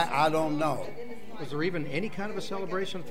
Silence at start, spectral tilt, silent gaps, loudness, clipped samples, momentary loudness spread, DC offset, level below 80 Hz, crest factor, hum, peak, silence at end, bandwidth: 0 s; -5.5 dB/octave; none; -31 LUFS; under 0.1%; 15 LU; 2%; -62 dBFS; 18 dB; none; -12 dBFS; 0 s; 16 kHz